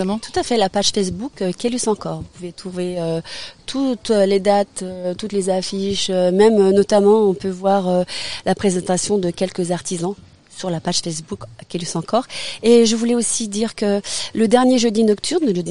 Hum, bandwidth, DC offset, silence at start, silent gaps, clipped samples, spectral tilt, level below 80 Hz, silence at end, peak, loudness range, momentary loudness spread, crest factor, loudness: none; 11 kHz; 0.7%; 0 s; none; under 0.1%; -4.5 dB/octave; -50 dBFS; 0 s; 0 dBFS; 6 LU; 13 LU; 18 dB; -18 LUFS